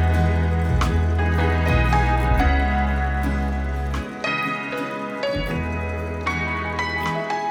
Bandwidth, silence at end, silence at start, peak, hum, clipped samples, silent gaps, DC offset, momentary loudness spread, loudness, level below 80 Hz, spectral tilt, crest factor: 14.5 kHz; 0 s; 0 s; -6 dBFS; none; under 0.1%; none; under 0.1%; 7 LU; -22 LUFS; -26 dBFS; -6.5 dB/octave; 14 dB